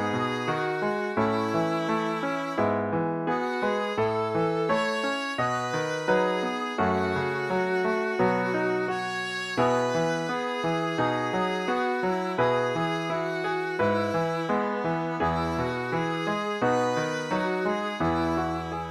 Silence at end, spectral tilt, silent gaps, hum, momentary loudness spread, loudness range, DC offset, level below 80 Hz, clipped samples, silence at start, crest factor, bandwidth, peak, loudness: 0 s; -5.5 dB/octave; none; none; 4 LU; 1 LU; under 0.1%; -58 dBFS; under 0.1%; 0 s; 16 dB; 14 kHz; -10 dBFS; -27 LUFS